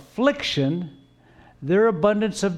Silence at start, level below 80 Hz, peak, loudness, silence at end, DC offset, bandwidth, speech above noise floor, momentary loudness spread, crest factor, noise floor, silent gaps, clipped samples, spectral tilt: 0.15 s; -56 dBFS; -6 dBFS; -22 LUFS; 0 s; under 0.1%; 13 kHz; 31 dB; 13 LU; 16 dB; -52 dBFS; none; under 0.1%; -5.5 dB/octave